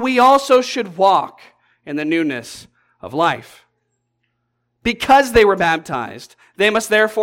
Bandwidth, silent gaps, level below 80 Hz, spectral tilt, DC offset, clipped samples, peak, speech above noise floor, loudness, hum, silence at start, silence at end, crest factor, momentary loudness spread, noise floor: 17 kHz; none; -46 dBFS; -4 dB/octave; under 0.1%; under 0.1%; -2 dBFS; 55 dB; -16 LUFS; none; 0 s; 0 s; 14 dB; 16 LU; -71 dBFS